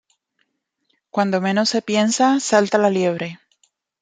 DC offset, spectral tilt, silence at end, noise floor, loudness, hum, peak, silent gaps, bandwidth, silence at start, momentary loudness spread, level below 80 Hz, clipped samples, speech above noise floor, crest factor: under 0.1%; -4 dB/octave; 0.65 s; -71 dBFS; -18 LUFS; none; -2 dBFS; none; 9.6 kHz; 1.15 s; 9 LU; -68 dBFS; under 0.1%; 53 dB; 18 dB